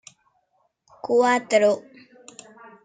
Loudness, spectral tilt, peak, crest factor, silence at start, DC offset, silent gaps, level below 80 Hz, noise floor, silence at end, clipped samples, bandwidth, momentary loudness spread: -21 LUFS; -3.5 dB/octave; -6 dBFS; 18 dB; 1.05 s; under 0.1%; none; -78 dBFS; -69 dBFS; 1.05 s; under 0.1%; 9.4 kHz; 19 LU